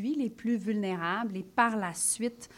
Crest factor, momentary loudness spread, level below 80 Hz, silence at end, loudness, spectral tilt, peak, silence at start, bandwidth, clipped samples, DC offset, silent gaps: 20 dB; 5 LU; -70 dBFS; 0 s; -30 LUFS; -3.5 dB/octave; -12 dBFS; 0 s; 16 kHz; under 0.1%; under 0.1%; none